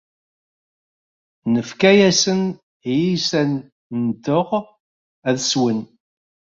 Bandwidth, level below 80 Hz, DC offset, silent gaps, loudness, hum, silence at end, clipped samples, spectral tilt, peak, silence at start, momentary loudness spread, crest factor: 7.8 kHz; -60 dBFS; under 0.1%; 2.63-2.80 s, 3.72-3.90 s, 4.80-5.22 s; -19 LUFS; none; 0.7 s; under 0.1%; -4.5 dB/octave; -2 dBFS; 1.45 s; 14 LU; 18 dB